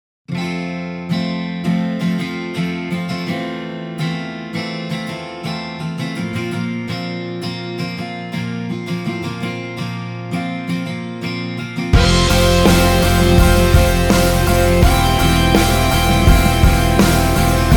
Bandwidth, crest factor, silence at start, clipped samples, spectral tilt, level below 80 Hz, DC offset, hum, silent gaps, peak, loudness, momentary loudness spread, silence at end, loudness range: over 20 kHz; 16 dB; 0.3 s; under 0.1%; -5 dB/octave; -22 dBFS; under 0.1%; none; none; 0 dBFS; -17 LUFS; 12 LU; 0 s; 11 LU